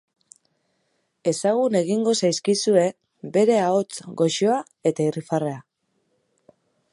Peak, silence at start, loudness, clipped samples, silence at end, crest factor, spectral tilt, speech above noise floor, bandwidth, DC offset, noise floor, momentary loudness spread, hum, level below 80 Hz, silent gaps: -4 dBFS; 1.25 s; -22 LUFS; under 0.1%; 1.3 s; 18 dB; -5 dB/octave; 50 dB; 11.5 kHz; under 0.1%; -71 dBFS; 8 LU; none; -74 dBFS; none